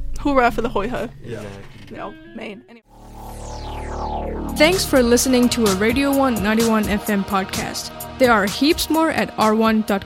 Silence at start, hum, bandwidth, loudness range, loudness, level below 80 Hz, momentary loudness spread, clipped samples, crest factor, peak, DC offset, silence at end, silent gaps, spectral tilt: 0 s; none; 16.5 kHz; 14 LU; -18 LUFS; -34 dBFS; 18 LU; under 0.1%; 18 dB; -2 dBFS; under 0.1%; 0 s; none; -4 dB/octave